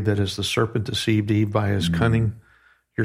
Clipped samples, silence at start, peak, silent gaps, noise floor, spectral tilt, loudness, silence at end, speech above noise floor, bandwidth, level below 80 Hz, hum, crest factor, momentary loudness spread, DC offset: under 0.1%; 0 s; -6 dBFS; none; -58 dBFS; -6 dB/octave; -22 LUFS; 0 s; 36 dB; 14.5 kHz; -44 dBFS; none; 16 dB; 4 LU; under 0.1%